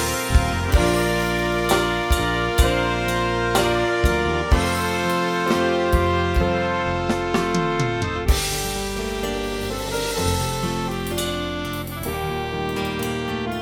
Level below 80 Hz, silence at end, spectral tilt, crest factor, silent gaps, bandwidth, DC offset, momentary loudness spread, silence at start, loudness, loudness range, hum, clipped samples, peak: -28 dBFS; 0 s; -4.5 dB/octave; 18 dB; none; 18.5 kHz; under 0.1%; 6 LU; 0 s; -22 LUFS; 5 LU; none; under 0.1%; -4 dBFS